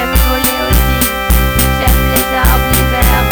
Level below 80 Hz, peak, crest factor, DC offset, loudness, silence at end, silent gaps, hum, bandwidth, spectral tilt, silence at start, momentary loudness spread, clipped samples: -14 dBFS; 0 dBFS; 10 dB; under 0.1%; -11 LUFS; 0 s; none; none; over 20 kHz; -4 dB/octave; 0 s; 2 LU; under 0.1%